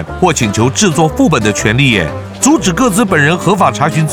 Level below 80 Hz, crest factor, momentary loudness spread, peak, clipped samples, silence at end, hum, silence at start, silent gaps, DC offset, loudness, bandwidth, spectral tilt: -32 dBFS; 10 dB; 3 LU; 0 dBFS; under 0.1%; 0 s; none; 0 s; none; under 0.1%; -11 LUFS; 18 kHz; -4.5 dB/octave